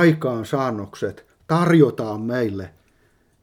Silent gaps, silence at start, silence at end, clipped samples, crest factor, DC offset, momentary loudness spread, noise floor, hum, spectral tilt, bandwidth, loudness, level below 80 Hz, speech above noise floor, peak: none; 0 s; 0.75 s; under 0.1%; 18 dB; under 0.1%; 14 LU; -60 dBFS; none; -7.5 dB/octave; 15 kHz; -21 LUFS; -60 dBFS; 41 dB; -2 dBFS